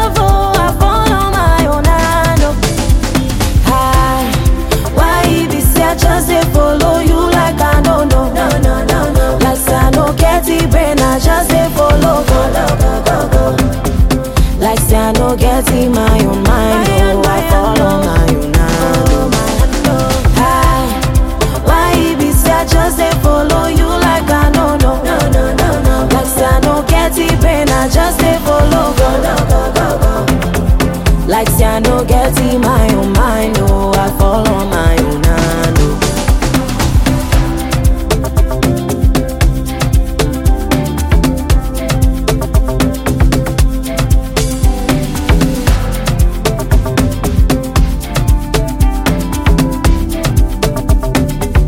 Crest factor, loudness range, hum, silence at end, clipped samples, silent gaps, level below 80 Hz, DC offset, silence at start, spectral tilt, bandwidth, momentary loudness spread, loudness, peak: 10 dB; 3 LU; none; 0 s; under 0.1%; none; -14 dBFS; under 0.1%; 0 s; -5.5 dB/octave; 17 kHz; 4 LU; -12 LUFS; 0 dBFS